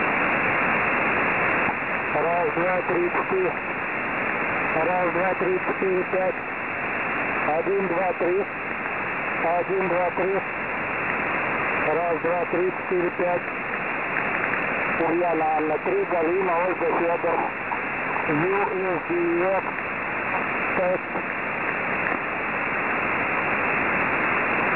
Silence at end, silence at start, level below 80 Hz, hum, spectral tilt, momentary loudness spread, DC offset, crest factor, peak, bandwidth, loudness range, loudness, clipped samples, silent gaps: 0 s; 0 s; -54 dBFS; none; -9 dB/octave; 5 LU; 0.2%; 16 dB; -8 dBFS; 4 kHz; 2 LU; -23 LUFS; under 0.1%; none